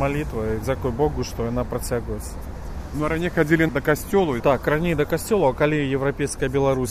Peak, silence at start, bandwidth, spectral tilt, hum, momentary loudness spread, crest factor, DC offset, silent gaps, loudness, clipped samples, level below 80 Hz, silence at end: -4 dBFS; 0 s; 15.5 kHz; -6 dB/octave; none; 10 LU; 18 dB; under 0.1%; none; -22 LUFS; under 0.1%; -34 dBFS; 0 s